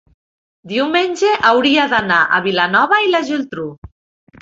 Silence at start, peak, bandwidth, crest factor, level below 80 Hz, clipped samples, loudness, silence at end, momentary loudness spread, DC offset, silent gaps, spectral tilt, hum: 0.65 s; 0 dBFS; 7.8 kHz; 16 dB; -52 dBFS; under 0.1%; -14 LUFS; 0.55 s; 10 LU; under 0.1%; 3.78-3.82 s; -4 dB/octave; none